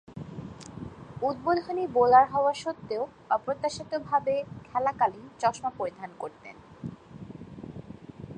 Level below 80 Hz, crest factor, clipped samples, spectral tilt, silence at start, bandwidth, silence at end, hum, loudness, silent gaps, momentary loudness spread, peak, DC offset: -60 dBFS; 22 dB; under 0.1%; -5.5 dB/octave; 0.1 s; 9.6 kHz; 0 s; none; -27 LUFS; none; 20 LU; -8 dBFS; under 0.1%